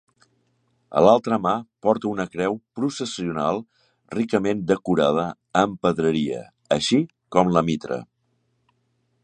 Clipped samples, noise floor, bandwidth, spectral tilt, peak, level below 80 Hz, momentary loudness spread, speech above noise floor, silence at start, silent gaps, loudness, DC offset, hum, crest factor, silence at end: under 0.1%; -70 dBFS; 9.8 kHz; -6 dB/octave; -2 dBFS; -56 dBFS; 9 LU; 48 dB; 0.9 s; none; -22 LUFS; under 0.1%; none; 22 dB; 1.2 s